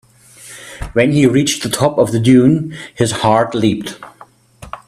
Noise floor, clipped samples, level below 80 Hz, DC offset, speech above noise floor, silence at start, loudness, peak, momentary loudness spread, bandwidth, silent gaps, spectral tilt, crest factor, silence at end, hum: -43 dBFS; under 0.1%; -42 dBFS; under 0.1%; 30 dB; 0.4 s; -14 LUFS; 0 dBFS; 22 LU; 14.5 kHz; none; -5.5 dB/octave; 14 dB; 0.1 s; none